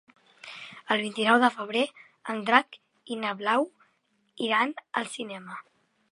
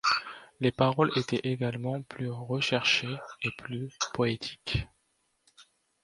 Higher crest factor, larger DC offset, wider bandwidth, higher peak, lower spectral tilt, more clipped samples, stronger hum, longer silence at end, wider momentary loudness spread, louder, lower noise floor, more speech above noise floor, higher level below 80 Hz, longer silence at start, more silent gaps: first, 28 dB vs 22 dB; neither; about the same, 11.5 kHz vs 11.5 kHz; first, -2 dBFS vs -8 dBFS; about the same, -3.5 dB/octave vs -4.5 dB/octave; neither; neither; about the same, 0.5 s vs 0.4 s; first, 20 LU vs 12 LU; first, -27 LUFS vs -30 LUFS; about the same, -71 dBFS vs -74 dBFS; about the same, 44 dB vs 44 dB; second, -84 dBFS vs -54 dBFS; first, 0.45 s vs 0.05 s; neither